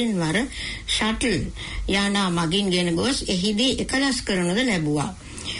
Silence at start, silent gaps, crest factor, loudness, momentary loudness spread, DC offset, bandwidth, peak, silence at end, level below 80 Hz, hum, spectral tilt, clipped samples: 0 s; none; 12 dB; -23 LUFS; 8 LU; under 0.1%; 11 kHz; -10 dBFS; 0 s; -38 dBFS; none; -4 dB/octave; under 0.1%